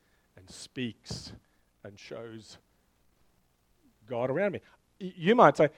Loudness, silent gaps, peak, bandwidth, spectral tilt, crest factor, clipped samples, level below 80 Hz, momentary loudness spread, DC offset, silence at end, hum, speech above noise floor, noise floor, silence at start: -28 LUFS; none; -4 dBFS; 12.5 kHz; -6 dB/octave; 28 dB; under 0.1%; -66 dBFS; 27 LU; under 0.1%; 0.1 s; none; 41 dB; -69 dBFS; 0.55 s